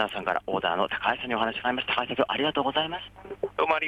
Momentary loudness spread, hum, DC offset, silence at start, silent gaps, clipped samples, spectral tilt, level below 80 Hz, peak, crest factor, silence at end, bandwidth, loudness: 8 LU; none; under 0.1%; 0 s; none; under 0.1%; -5.5 dB/octave; -58 dBFS; -10 dBFS; 18 dB; 0 s; 14.5 kHz; -27 LUFS